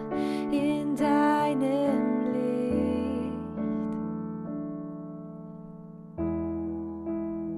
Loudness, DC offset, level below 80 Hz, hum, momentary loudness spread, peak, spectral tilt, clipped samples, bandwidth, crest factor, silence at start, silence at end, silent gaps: -29 LUFS; under 0.1%; -52 dBFS; none; 16 LU; -14 dBFS; -7.5 dB/octave; under 0.1%; 12.5 kHz; 16 dB; 0 s; 0 s; none